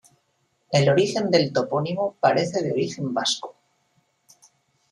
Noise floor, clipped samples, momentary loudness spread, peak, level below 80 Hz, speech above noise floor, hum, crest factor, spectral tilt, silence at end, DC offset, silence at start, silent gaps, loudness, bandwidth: -70 dBFS; under 0.1%; 7 LU; -4 dBFS; -64 dBFS; 48 dB; none; 20 dB; -5 dB/octave; 1.4 s; under 0.1%; 0.7 s; none; -22 LUFS; 11.5 kHz